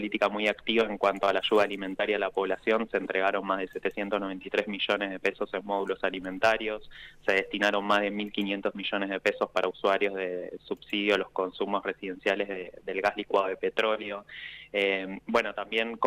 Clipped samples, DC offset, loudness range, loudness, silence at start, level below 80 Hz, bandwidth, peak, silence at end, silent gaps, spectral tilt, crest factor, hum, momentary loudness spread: under 0.1%; under 0.1%; 3 LU; -29 LUFS; 0 s; -62 dBFS; 15 kHz; -12 dBFS; 0 s; none; -4.5 dB/octave; 16 dB; 50 Hz at -65 dBFS; 8 LU